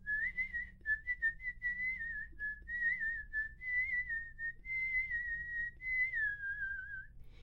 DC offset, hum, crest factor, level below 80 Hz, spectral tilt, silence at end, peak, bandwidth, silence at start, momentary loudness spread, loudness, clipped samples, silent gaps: under 0.1%; none; 12 dB; -56 dBFS; -4.5 dB/octave; 0 s; -26 dBFS; 7 kHz; 0 s; 8 LU; -37 LUFS; under 0.1%; none